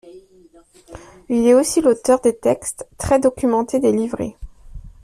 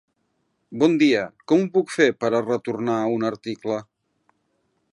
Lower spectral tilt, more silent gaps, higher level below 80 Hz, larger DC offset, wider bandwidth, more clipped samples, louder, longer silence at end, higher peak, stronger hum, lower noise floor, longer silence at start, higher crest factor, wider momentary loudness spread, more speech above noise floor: about the same, -5 dB/octave vs -6 dB/octave; neither; first, -42 dBFS vs -70 dBFS; neither; first, 14.5 kHz vs 11 kHz; neither; first, -18 LUFS vs -22 LUFS; second, 0.15 s vs 1.1 s; about the same, -2 dBFS vs -4 dBFS; neither; second, -50 dBFS vs -71 dBFS; second, 0.05 s vs 0.7 s; about the same, 16 dB vs 20 dB; first, 13 LU vs 10 LU; second, 33 dB vs 50 dB